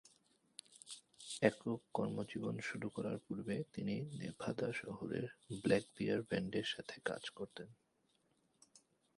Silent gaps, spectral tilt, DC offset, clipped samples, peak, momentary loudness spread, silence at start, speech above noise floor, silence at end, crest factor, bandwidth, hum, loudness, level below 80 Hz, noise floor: none; -5.5 dB/octave; under 0.1%; under 0.1%; -16 dBFS; 17 LU; 0.7 s; 38 dB; 0.4 s; 26 dB; 11.5 kHz; none; -42 LUFS; -74 dBFS; -79 dBFS